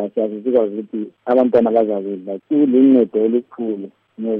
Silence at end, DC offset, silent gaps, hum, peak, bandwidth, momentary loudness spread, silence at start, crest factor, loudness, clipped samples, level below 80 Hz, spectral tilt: 0 s; under 0.1%; none; none; -4 dBFS; 3.8 kHz; 15 LU; 0 s; 14 dB; -17 LUFS; under 0.1%; -64 dBFS; -10 dB/octave